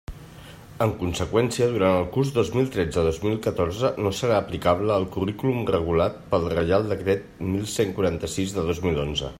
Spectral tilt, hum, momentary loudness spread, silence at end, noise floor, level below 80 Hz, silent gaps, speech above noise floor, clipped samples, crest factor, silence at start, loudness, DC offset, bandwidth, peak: -6 dB/octave; none; 6 LU; 0 s; -43 dBFS; -46 dBFS; none; 20 dB; under 0.1%; 18 dB; 0.1 s; -24 LUFS; under 0.1%; 16 kHz; -6 dBFS